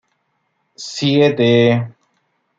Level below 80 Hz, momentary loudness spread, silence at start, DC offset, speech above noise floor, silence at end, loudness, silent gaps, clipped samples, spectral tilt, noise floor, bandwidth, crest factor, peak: -62 dBFS; 18 LU; 0.8 s; under 0.1%; 53 dB; 0.7 s; -14 LUFS; none; under 0.1%; -6 dB/octave; -68 dBFS; 7.8 kHz; 16 dB; -2 dBFS